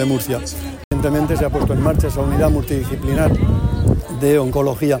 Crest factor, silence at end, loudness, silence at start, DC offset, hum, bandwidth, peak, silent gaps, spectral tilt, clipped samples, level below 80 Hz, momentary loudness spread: 12 dB; 0 s; -18 LUFS; 0 s; under 0.1%; none; 16.5 kHz; -4 dBFS; 0.84-0.91 s; -7 dB/octave; under 0.1%; -24 dBFS; 6 LU